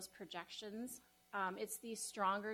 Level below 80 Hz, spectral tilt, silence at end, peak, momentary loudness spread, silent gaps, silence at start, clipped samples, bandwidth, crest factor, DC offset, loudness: -82 dBFS; -2.5 dB/octave; 0 s; -26 dBFS; 11 LU; none; 0 s; under 0.1%; 19 kHz; 18 dB; under 0.1%; -45 LUFS